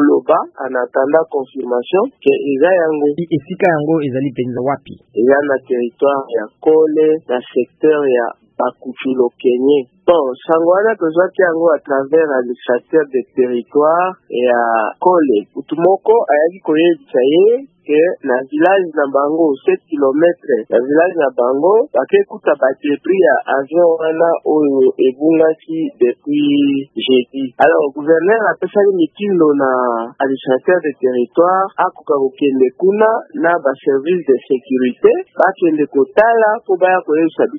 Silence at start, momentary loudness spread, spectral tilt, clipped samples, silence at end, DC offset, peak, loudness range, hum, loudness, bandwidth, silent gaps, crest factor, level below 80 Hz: 0 s; 7 LU; -9 dB/octave; under 0.1%; 0 s; under 0.1%; 0 dBFS; 2 LU; none; -14 LUFS; 3.8 kHz; none; 14 dB; -66 dBFS